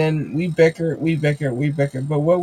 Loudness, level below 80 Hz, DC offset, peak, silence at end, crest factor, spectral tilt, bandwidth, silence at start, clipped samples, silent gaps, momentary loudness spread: -20 LUFS; -56 dBFS; under 0.1%; -4 dBFS; 0 s; 16 dB; -8 dB/octave; 10.5 kHz; 0 s; under 0.1%; none; 5 LU